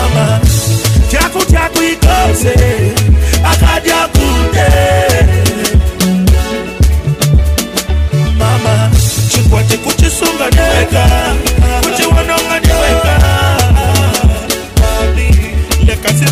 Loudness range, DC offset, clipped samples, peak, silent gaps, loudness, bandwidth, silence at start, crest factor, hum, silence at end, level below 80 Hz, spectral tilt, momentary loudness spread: 2 LU; 0.2%; under 0.1%; 0 dBFS; none; -10 LUFS; 16 kHz; 0 s; 8 dB; none; 0 s; -12 dBFS; -4.5 dB/octave; 3 LU